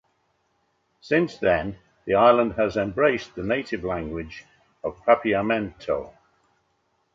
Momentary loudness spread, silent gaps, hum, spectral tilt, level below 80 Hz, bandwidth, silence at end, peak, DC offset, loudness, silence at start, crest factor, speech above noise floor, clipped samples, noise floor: 16 LU; none; none; -7 dB/octave; -50 dBFS; 7.6 kHz; 1.05 s; -4 dBFS; under 0.1%; -23 LUFS; 1.05 s; 20 dB; 47 dB; under 0.1%; -70 dBFS